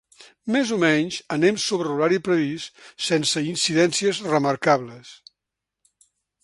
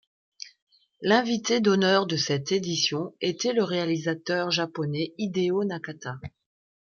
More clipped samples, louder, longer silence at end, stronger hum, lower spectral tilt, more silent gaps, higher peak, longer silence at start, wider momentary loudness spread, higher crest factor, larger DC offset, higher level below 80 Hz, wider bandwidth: neither; first, -21 LUFS vs -26 LUFS; first, 1.3 s vs 0.6 s; neither; about the same, -4 dB/octave vs -4.5 dB/octave; second, none vs 0.62-0.67 s; first, -4 dBFS vs -8 dBFS; second, 0.2 s vs 0.45 s; second, 10 LU vs 15 LU; about the same, 20 dB vs 20 dB; neither; about the same, -66 dBFS vs -68 dBFS; first, 11.5 kHz vs 7.2 kHz